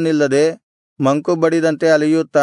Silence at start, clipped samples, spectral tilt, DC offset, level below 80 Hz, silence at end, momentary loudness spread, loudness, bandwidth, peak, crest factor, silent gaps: 0 s; under 0.1%; -6 dB/octave; under 0.1%; -66 dBFS; 0 s; 4 LU; -16 LUFS; 11 kHz; -2 dBFS; 12 dB; 0.63-0.96 s